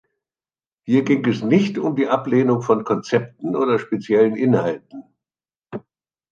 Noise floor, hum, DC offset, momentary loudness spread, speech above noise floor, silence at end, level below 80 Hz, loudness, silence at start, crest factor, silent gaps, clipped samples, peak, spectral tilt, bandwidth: under -90 dBFS; none; under 0.1%; 16 LU; over 72 dB; 0.5 s; -66 dBFS; -19 LUFS; 0.85 s; 18 dB; none; under 0.1%; -2 dBFS; -7.5 dB/octave; 7.6 kHz